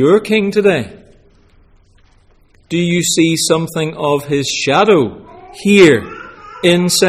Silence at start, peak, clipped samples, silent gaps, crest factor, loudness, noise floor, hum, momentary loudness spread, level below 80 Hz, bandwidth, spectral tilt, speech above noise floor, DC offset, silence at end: 0 s; 0 dBFS; under 0.1%; none; 14 dB; -13 LUFS; -49 dBFS; none; 12 LU; -48 dBFS; 15.5 kHz; -4.5 dB/octave; 37 dB; under 0.1%; 0 s